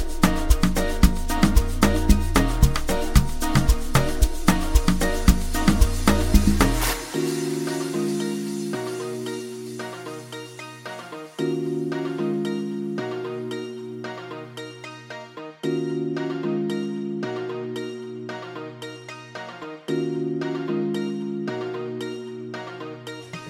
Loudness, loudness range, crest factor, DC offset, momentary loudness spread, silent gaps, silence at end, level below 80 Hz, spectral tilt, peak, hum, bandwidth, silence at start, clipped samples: -25 LUFS; 10 LU; 22 dB; under 0.1%; 15 LU; none; 0 s; -26 dBFS; -5.5 dB/octave; 0 dBFS; none; 17 kHz; 0 s; under 0.1%